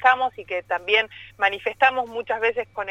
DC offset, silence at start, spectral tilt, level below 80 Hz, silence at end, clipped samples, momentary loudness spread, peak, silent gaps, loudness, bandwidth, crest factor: under 0.1%; 0 s; -3 dB/octave; -62 dBFS; 0 s; under 0.1%; 9 LU; -4 dBFS; none; -23 LUFS; 8 kHz; 18 dB